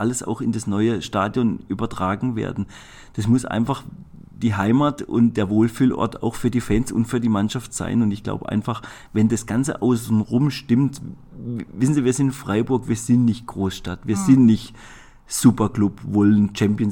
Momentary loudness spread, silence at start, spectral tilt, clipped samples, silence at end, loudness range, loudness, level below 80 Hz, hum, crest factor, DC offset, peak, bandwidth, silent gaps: 11 LU; 0 s; -6.5 dB/octave; under 0.1%; 0 s; 4 LU; -21 LUFS; -44 dBFS; none; 18 dB; under 0.1%; -2 dBFS; 18 kHz; none